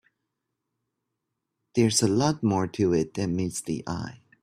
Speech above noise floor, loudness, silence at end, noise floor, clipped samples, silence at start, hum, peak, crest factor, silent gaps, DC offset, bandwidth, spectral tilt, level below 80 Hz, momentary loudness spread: 57 dB; -26 LUFS; 0.25 s; -82 dBFS; under 0.1%; 1.75 s; none; -8 dBFS; 20 dB; none; under 0.1%; 15 kHz; -5 dB/octave; -60 dBFS; 11 LU